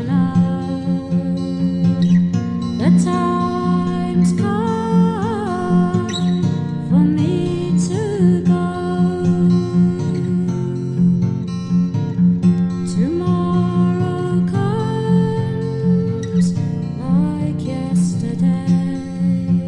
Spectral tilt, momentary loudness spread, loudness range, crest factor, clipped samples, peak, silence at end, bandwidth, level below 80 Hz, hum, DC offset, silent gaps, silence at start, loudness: -8 dB/octave; 6 LU; 2 LU; 14 dB; under 0.1%; -2 dBFS; 0 s; 10 kHz; -50 dBFS; none; under 0.1%; none; 0 s; -18 LUFS